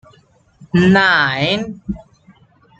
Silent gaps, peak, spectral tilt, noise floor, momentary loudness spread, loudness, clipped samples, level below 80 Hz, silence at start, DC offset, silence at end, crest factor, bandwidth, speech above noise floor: none; -2 dBFS; -6 dB/octave; -52 dBFS; 18 LU; -14 LUFS; under 0.1%; -44 dBFS; 0.6 s; under 0.1%; 0.8 s; 16 dB; 8 kHz; 38 dB